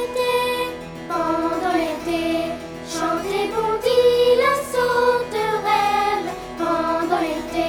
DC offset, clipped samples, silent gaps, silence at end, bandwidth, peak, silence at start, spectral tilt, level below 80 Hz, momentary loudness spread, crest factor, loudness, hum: under 0.1%; under 0.1%; none; 0 s; 19 kHz; -6 dBFS; 0 s; -4 dB/octave; -48 dBFS; 10 LU; 14 dB; -21 LUFS; none